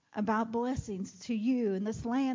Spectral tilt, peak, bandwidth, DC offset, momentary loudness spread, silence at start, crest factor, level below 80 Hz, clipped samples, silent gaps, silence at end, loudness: -6.5 dB/octave; -20 dBFS; 7.6 kHz; under 0.1%; 7 LU; 0.15 s; 12 dB; -56 dBFS; under 0.1%; none; 0 s; -33 LUFS